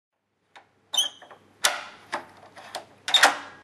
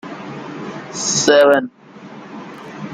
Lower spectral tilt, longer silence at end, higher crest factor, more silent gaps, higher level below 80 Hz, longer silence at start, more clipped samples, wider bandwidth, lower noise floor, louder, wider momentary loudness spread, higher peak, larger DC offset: second, 1.5 dB/octave vs -2.5 dB/octave; about the same, 0.1 s vs 0 s; first, 28 dB vs 18 dB; neither; second, -78 dBFS vs -64 dBFS; first, 0.95 s vs 0.05 s; neither; second, 13.5 kHz vs 15 kHz; first, -56 dBFS vs -37 dBFS; second, -23 LUFS vs -14 LUFS; second, 20 LU vs 23 LU; about the same, 0 dBFS vs -2 dBFS; neither